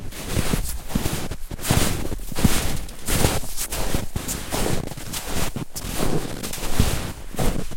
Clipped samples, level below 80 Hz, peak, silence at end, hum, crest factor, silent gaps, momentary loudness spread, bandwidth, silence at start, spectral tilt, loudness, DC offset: under 0.1%; -30 dBFS; -2 dBFS; 0 s; none; 20 dB; none; 9 LU; 16.5 kHz; 0 s; -4 dB/octave; -26 LUFS; under 0.1%